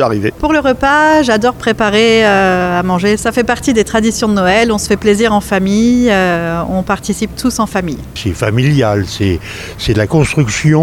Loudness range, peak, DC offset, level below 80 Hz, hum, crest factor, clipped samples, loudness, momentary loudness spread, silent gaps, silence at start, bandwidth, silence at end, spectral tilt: 4 LU; 0 dBFS; under 0.1%; -32 dBFS; none; 12 dB; under 0.1%; -12 LUFS; 7 LU; none; 0 s; 18 kHz; 0 s; -5 dB/octave